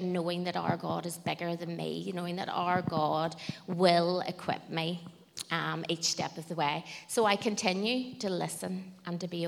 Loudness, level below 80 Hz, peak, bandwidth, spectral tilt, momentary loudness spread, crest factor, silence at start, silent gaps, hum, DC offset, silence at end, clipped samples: -32 LUFS; -74 dBFS; -10 dBFS; 16 kHz; -4.5 dB/octave; 10 LU; 22 dB; 0 s; none; none; under 0.1%; 0 s; under 0.1%